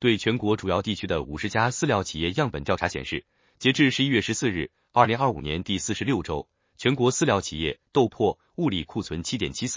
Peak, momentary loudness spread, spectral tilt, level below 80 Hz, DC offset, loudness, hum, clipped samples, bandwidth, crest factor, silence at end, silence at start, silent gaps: -4 dBFS; 9 LU; -4.5 dB/octave; -46 dBFS; under 0.1%; -25 LUFS; none; under 0.1%; 7.8 kHz; 22 dB; 0 s; 0 s; none